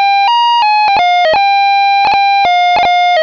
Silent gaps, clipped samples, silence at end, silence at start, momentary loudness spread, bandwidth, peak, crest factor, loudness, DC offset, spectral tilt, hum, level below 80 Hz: none; under 0.1%; 0 s; 0 s; 0 LU; 5.4 kHz; -4 dBFS; 6 dB; -9 LUFS; under 0.1%; -1.5 dB/octave; none; -48 dBFS